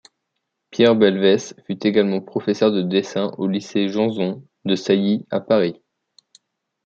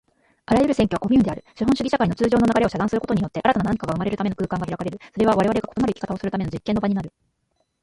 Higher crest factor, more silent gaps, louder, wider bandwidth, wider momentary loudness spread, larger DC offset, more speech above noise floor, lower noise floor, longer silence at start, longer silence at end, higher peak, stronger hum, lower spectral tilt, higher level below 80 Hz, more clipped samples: about the same, 18 dB vs 18 dB; neither; about the same, -20 LUFS vs -22 LUFS; second, 7.8 kHz vs 11.5 kHz; about the same, 10 LU vs 8 LU; neither; first, 58 dB vs 50 dB; first, -77 dBFS vs -71 dBFS; first, 0.75 s vs 0.5 s; first, 1.1 s vs 0.75 s; about the same, -2 dBFS vs -4 dBFS; neither; about the same, -6 dB/octave vs -7 dB/octave; second, -66 dBFS vs -46 dBFS; neither